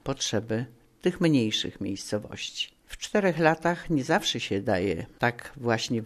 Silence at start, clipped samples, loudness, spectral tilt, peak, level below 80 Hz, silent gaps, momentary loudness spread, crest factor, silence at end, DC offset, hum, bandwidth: 0.05 s; under 0.1%; -27 LUFS; -4.5 dB/octave; -6 dBFS; -54 dBFS; none; 10 LU; 22 dB; 0 s; under 0.1%; none; 13.5 kHz